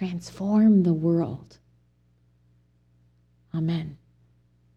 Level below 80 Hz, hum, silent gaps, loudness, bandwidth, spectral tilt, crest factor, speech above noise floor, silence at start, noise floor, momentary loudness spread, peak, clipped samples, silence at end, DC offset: -60 dBFS; 60 Hz at -60 dBFS; none; -24 LUFS; 8.6 kHz; -9 dB/octave; 16 dB; 40 dB; 0 s; -63 dBFS; 16 LU; -10 dBFS; under 0.1%; 0.8 s; under 0.1%